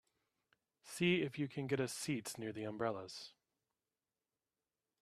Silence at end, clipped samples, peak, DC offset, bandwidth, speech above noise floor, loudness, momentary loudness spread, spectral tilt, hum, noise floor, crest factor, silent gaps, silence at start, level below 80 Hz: 1.75 s; under 0.1%; -22 dBFS; under 0.1%; 14.5 kHz; over 50 dB; -40 LUFS; 16 LU; -5 dB/octave; none; under -90 dBFS; 22 dB; none; 0.85 s; -80 dBFS